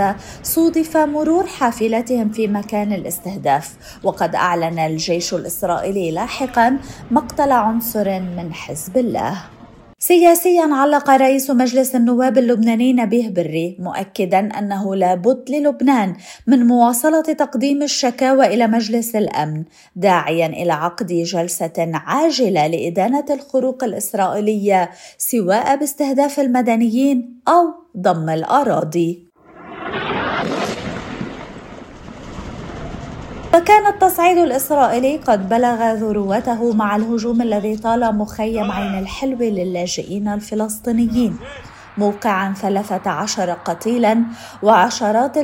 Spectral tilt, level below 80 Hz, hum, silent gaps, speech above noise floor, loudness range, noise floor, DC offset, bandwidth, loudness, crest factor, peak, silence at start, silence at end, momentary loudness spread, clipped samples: -5 dB/octave; -46 dBFS; none; none; 22 dB; 6 LU; -38 dBFS; under 0.1%; 16.5 kHz; -17 LUFS; 16 dB; 0 dBFS; 0 s; 0 s; 12 LU; under 0.1%